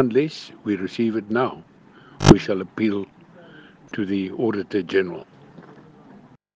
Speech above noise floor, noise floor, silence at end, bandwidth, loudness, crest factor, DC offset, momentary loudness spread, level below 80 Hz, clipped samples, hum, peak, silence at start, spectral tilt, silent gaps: 28 dB; -49 dBFS; 0.75 s; 9.4 kHz; -22 LUFS; 24 dB; under 0.1%; 16 LU; -44 dBFS; under 0.1%; none; 0 dBFS; 0 s; -6.5 dB/octave; none